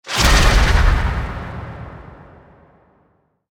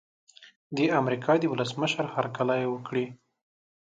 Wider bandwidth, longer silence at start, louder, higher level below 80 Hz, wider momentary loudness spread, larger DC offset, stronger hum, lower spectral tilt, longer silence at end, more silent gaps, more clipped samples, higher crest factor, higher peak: first, 18 kHz vs 9.2 kHz; second, 0.05 s vs 0.4 s; first, -16 LUFS vs -28 LUFS; first, -20 dBFS vs -72 dBFS; first, 22 LU vs 7 LU; neither; neither; second, -4 dB/octave vs -6 dB/octave; first, 1.35 s vs 0.7 s; second, none vs 0.56-0.70 s; neither; about the same, 16 dB vs 18 dB; first, -2 dBFS vs -10 dBFS